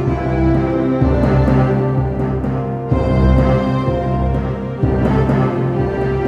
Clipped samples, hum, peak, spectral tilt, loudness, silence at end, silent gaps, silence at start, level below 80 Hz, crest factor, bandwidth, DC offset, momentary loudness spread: under 0.1%; none; -2 dBFS; -9.5 dB/octave; -16 LUFS; 0 s; none; 0 s; -22 dBFS; 12 dB; 6 kHz; under 0.1%; 6 LU